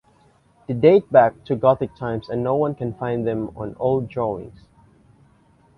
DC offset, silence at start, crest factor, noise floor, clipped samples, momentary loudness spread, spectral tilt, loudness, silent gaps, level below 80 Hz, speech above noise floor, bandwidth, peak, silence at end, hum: under 0.1%; 0.7 s; 20 dB; -57 dBFS; under 0.1%; 13 LU; -9.5 dB/octave; -20 LUFS; none; -52 dBFS; 37 dB; 5.4 kHz; -2 dBFS; 1.25 s; none